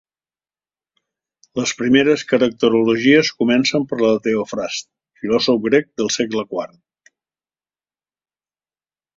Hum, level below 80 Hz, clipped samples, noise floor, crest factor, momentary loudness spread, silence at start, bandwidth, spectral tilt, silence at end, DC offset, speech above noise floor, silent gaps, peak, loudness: none; -60 dBFS; under 0.1%; under -90 dBFS; 18 dB; 12 LU; 1.55 s; 7.8 kHz; -4 dB/octave; 2.5 s; under 0.1%; over 73 dB; none; -2 dBFS; -17 LUFS